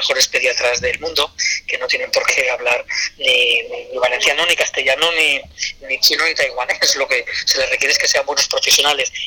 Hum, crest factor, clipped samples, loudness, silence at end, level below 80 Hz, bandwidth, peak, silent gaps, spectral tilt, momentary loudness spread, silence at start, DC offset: none; 14 dB; under 0.1%; -15 LUFS; 0 s; -48 dBFS; 19 kHz; -4 dBFS; none; 1 dB/octave; 6 LU; 0 s; under 0.1%